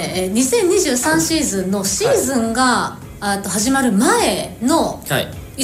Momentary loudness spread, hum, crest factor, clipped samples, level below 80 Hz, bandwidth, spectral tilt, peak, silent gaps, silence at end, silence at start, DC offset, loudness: 7 LU; none; 14 dB; under 0.1%; -42 dBFS; 16 kHz; -3.5 dB/octave; -4 dBFS; none; 0 s; 0 s; under 0.1%; -16 LUFS